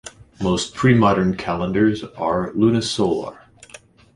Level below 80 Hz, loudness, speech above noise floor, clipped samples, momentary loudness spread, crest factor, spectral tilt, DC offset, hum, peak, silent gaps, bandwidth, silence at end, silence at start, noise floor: -46 dBFS; -19 LUFS; 27 dB; under 0.1%; 11 LU; 18 dB; -6 dB/octave; under 0.1%; none; -2 dBFS; none; 11.5 kHz; 0.4 s; 0.05 s; -46 dBFS